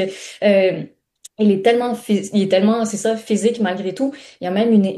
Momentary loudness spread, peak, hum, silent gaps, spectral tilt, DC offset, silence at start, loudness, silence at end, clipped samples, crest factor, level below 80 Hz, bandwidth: 9 LU; -2 dBFS; none; none; -5.5 dB/octave; under 0.1%; 0 s; -18 LUFS; 0 s; under 0.1%; 16 dB; -66 dBFS; 12.5 kHz